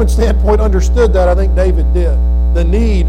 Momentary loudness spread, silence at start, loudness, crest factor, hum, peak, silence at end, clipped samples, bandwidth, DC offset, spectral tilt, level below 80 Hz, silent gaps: 3 LU; 0 s; -12 LUFS; 8 dB; none; -2 dBFS; 0 s; under 0.1%; 9.4 kHz; under 0.1%; -7.5 dB/octave; -10 dBFS; none